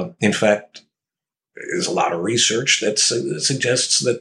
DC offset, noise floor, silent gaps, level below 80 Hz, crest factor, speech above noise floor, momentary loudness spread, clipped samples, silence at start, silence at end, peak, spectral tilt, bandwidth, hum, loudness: under 0.1%; -89 dBFS; none; -68 dBFS; 20 dB; 70 dB; 7 LU; under 0.1%; 0 s; 0 s; -2 dBFS; -2.5 dB/octave; 12.5 kHz; none; -18 LUFS